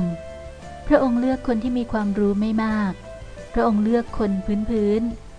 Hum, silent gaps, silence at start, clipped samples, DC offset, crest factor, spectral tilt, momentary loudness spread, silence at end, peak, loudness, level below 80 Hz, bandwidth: none; none; 0 s; under 0.1%; under 0.1%; 18 dB; -8 dB/octave; 18 LU; 0 s; -4 dBFS; -22 LUFS; -38 dBFS; 10 kHz